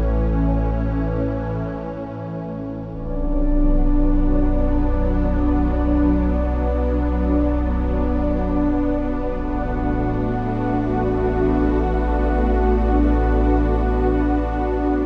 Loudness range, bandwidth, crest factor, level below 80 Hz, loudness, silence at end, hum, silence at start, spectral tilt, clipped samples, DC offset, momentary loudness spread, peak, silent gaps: 5 LU; 4.7 kHz; 12 dB; -22 dBFS; -21 LUFS; 0 s; none; 0 s; -10.5 dB/octave; under 0.1%; under 0.1%; 7 LU; -6 dBFS; none